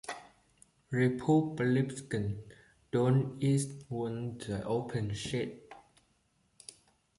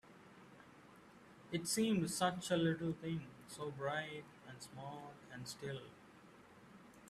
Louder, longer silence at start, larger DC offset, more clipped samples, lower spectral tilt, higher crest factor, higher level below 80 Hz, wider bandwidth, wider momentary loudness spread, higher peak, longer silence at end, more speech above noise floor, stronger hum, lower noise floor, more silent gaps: first, -33 LUFS vs -41 LUFS; about the same, 0.05 s vs 0.05 s; neither; neither; first, -6.5 dB/octave vs -4.5 dB/octave; about the same, 18 dB vs 20 dB; first, -62 dBFS vs -76 dBFS; second, 11.5 kHz vs 14 kHz; second, 18 LU vs 25 LU; first, -16 dBFS vs -24 dBFS; first, 1.4 s vs 0 s; first, 41 dB vs 21 dB; neither; first, -73 dBFS vs -62 dBFS; neither